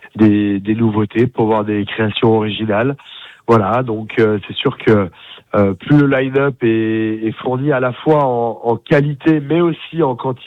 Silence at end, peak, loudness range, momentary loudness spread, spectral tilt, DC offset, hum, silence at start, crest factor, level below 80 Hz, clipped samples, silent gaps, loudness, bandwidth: 0 s; -2 dBFS; 1 LU; 7 LU; -9 dB/octave; under 0.1%; none; 0.05 s; 12 dB; -50 dBFS; under 0.1%; none; -15 LUFS; 6.2 kHz